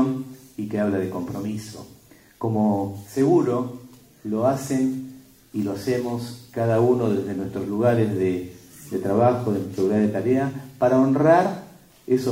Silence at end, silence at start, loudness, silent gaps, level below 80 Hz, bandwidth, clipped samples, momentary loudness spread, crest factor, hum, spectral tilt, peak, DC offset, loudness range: 0 s; 0 s; -23 LUFS; none; -60 dBFS; 16 kHz; under 0.1%; 15 LU; 18 dB; none; -7.5 dB/octave; -4 dBFS; under 0.1%; 4 LU